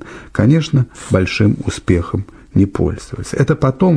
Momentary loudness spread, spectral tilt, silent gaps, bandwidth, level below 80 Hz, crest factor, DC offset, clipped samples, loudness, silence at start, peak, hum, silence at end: 10 LU; -7 dB/octave; none; 11 kHz; -34 dBFS; 14 dB; under 0.1%; under 0.1%; -16 LUFS; 0.05 s; -2 dBFS; none; 0 s